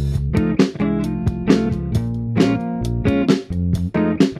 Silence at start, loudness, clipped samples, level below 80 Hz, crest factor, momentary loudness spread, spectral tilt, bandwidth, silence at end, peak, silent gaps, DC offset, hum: 0 s; -19 LUFS; under 0.1%; -32 dBFS; 18 dB; 5 LU; -7.5 dB/octave; 13.5 kHz; 0 s; 0 dBFS; none; under 0.1%; none